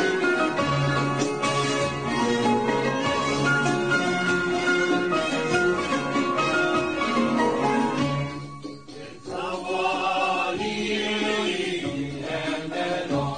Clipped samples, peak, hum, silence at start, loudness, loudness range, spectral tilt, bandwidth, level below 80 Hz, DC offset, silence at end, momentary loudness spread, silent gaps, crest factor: under 0.1%; -10 dBFS; none; 0 s; -24 LUFS; 3 LU; -4.5 dB/octave; 9.6 kHz; -54 dBFS; 0.3%; 0 s; 8 LU; none; 14 dB